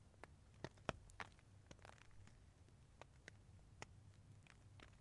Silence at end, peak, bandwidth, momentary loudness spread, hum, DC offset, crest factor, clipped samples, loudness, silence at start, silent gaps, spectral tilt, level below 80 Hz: 0 s; -22 dBFS; 11 kHz; 16 LU; none; under 0.1%; 38 dB; under 0.1%; -60 LUFS; 0 s; none; -4.5 dB/octave; -70 dBFS